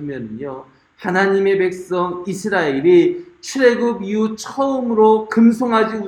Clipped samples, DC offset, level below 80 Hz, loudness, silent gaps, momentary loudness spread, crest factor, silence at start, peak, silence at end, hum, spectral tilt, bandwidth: under 0.1%; under 0.1%; -60 dBFS; -16 LUFS; none; 15 LU; 16 dB; 0 s; 0 dBFS; 0 s; none; -6 dB/octave; 12.5 kHz